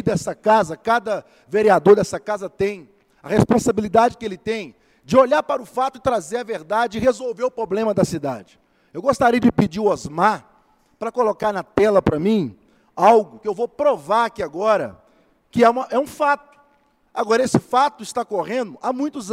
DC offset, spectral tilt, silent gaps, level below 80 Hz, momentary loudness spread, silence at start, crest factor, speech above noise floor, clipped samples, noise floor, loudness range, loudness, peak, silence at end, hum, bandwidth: under 0.1%; -6 dB/octave; none; -52 dBFS; 12 LU; 0.05 s; 20 dB; 41 dB; under 0.1%; -60 dBFS; 3 LU; -20 LUFS; 0 dBFS; 0 s; none; 15.5 kHz